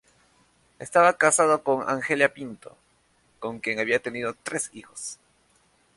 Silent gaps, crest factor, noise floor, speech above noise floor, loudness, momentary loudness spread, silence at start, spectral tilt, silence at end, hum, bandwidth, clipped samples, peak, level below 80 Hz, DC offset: none; 22 dB; -65 dBFS; 40 dB; -23 LUFS; 18 LU; 0.8 s; -3 dB/octave; 0.8 s; none; 11.5 kHz; under 0.1%; -4 dBFS; -68 dBFS; under 0.1%